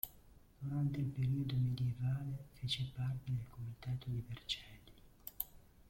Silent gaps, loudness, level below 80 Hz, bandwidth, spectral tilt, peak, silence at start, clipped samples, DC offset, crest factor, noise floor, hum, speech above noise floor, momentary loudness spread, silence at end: none; -41 LUFS; -62 dBFS; 16.5 kHz; -6 dB/octave; -20 dBFS; 0.05 s; under 0.1%; under 0.1%; 22 dB; -63 dBFS; none; 23 dB; 12 LU; 0.3 s